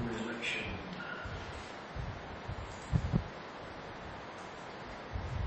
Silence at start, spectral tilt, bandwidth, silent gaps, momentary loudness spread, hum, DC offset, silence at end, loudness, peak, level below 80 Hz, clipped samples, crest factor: 0 s; -6 dB/octave; 8.4 kHz; none; 10 LU; none; under 0.1%; 0 s; -40 LUFS; -16 dBFS; -48 dBFS; under 0.1%; 24 dB